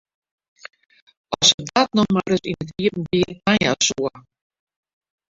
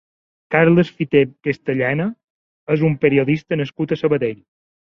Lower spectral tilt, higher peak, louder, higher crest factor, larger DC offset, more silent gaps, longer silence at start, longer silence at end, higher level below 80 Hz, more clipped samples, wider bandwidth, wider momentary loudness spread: second, -3.5 dB/octave vs -9 dB/octave; about the same, 0 dBFS vs -2 dBFS; about the same, -19 LUFS vs -18 LUFS; about the same, 22 dB vs 18 dB; neither; second, 1.54-1.58 s vs 2.24-2.67 s; first, 1.3 s vs 0.5 s; first, 1.1 s vs 0.6 s; about the same, -52 dBFS vs -56 dBFS; neither; first, 7.8 kHz vs 6.6 kHz; about the same, 11 LU vs 9 LU